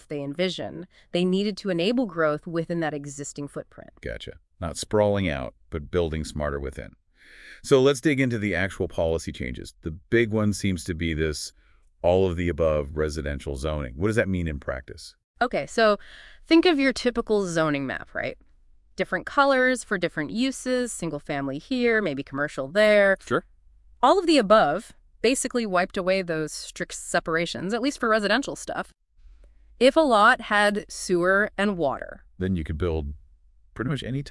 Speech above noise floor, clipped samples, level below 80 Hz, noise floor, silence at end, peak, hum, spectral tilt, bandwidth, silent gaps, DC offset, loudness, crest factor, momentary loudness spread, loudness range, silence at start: 31 dB; under 0.1%; -46 dBFS; -56 dBFS; 0 s; -4 dBFS; none; -5 dB/octave; 12 kHz; 15.24-15.34 s; under 0.1%; -24 LUFS; 20 dB; 16 LU; 6 LU; 0.1 s